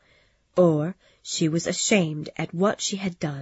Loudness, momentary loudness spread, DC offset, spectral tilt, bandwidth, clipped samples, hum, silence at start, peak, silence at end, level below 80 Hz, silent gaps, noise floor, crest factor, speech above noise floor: -24 LUFS; 11 LU; under 0.1%; -4.5 dB/octave; 8 kHz; under 0.1%; none; 0.55 s; -8 dBFS; 0 s; -64 dBFS; none; -62 dBFS; 18 dB; 38 dB